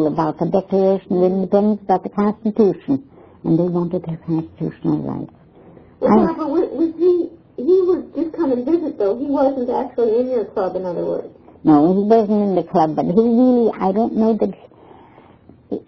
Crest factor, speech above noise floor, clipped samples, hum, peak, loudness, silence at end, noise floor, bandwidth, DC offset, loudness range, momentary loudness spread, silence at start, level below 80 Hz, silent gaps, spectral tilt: 18 dB; 30 dB; under 0.1%; none; 0 dBFS; -18 LUFS; 0.1 s; -47 dBFS; 5.4 kHz; under 0.1%; 5 LU; 10 LU; 0 s; -54 dBFS; none; -10.5 dB/octave